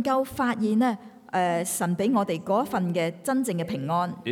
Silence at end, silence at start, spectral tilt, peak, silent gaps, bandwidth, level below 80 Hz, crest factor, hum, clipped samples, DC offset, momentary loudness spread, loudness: 0 s; 0 s; -5.5 dB/octave; -12 dBFS; none; 18.5 kHz; -64 dBFS; 14 dB; none; under 0.1%; under 0.1%; 4 LU; -26 LUFS